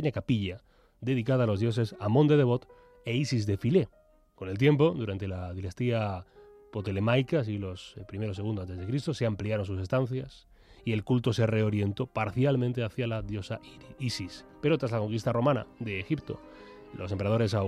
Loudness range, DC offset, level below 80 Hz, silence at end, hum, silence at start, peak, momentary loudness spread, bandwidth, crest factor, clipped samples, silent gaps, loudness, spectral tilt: 4 LU; under 0.1%; -58 dBFS; 0 s; none; 0 s; -12 dBFS; 14 LU; 11.5 kHz; 18 dB; under 0.1%; none; -30 LUFS; -7.5 dB/octave